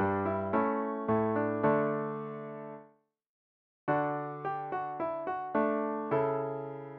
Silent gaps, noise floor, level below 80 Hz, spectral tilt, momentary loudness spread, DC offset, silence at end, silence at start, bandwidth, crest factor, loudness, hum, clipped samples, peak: 3.29-3.87 s; -65 dBFS; -70 dBFS; -7.5 dB/octave; 12 LU; under 0.1%; 0 s; 0 s; 4.5 kHz; 18 dB; -32 LUFS; none; under 0.1%; -16 dBFS